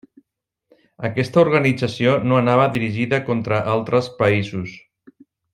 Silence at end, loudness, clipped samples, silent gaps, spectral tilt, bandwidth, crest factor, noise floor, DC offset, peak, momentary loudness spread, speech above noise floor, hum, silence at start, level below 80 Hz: 0.75 s; -19 LUFS; under 0.1%; none; -7 dB/octave; 12 kHz; 18 dB; -75 dBFS; under 0.1%; -2 dBFS; 10 LU; 57 dB; none; 1 s; -56 dBFS